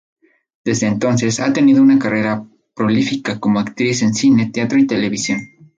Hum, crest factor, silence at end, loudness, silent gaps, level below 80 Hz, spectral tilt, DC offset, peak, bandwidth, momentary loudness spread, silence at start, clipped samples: none; 12 dB; 0.3 s; -16 LUFS; none; -54 dBFS; -5 dB/octave; under 0.1%; -4 dBFS; 9.2 kHz; 9 LU; 0.65 s; under 0.1%